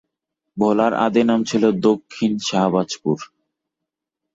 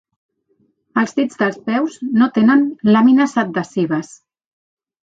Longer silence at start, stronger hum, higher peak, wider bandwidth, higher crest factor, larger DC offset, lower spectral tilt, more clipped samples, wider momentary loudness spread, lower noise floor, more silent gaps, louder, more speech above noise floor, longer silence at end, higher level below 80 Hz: second, 0.55 s vs 0.95 s; neither; about the same, -4 dBFS vs -2 dBFS; about the same, 7.8 kHz vs 8 kHz; about the same, 16 dB vs 16 dB; neither; about the same, -5.5 dB/octave vs -6.5 dB/octave; neither; about the same, 7 LU vs 9 LU; first, -83 dBFS vs -62 dBFS; neither; second, -19 LUFS vs -16 LUFS; first, 65 dB vs 47 dB; about the same, 1.1 s vs 1 s; about the same, -62 dBFS vs -62 dBFS